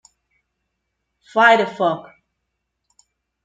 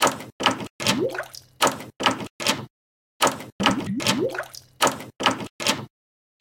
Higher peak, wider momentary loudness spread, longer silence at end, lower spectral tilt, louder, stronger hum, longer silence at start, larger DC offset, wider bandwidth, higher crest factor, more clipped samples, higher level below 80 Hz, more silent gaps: about the same, -2 dBFS vs -2 dBFS; first, 12 LU vs 8 LU; first, 1.45 s vs 0.55 s; first, -4.5 dB/octave vs -2.5 dB/octave; first, -17 LUFS vs -24 LUFS; neither; first, 1.35 s vs 0 s; neither; second, 9 kHz vs 17 kHz; about the same, 20 dB vs 24 dB; neither; second, -72 dBFS vs -60 dBFS; second, none vs 0.32-0.39 s, 0.70-0.79 s, 2.30-2.39 s, 2.70-3.20 s, 3.52-3.59 s, 5.50-5.59 s